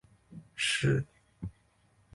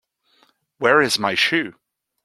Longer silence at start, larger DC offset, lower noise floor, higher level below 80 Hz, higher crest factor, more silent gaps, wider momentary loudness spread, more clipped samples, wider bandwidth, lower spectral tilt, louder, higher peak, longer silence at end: second, 0.3 s vs 0.8 s; neither; first, -67 dBFS vs -61 dBFS; first, -56 dBFS vs -64 dBFS; about the same, 18 dB vs 20 dB; neither; first, 23 LU vs 7 LU; neither; second, 11.5 kHz vs 15.5 kHz; about the same, -4 dB/octave vs -3 dB/octave; second, -30 LUFS vs -18 LUFS; second, -18 dBFS vs -2 dBFS; about the same, 0.65 s vs 0.55 s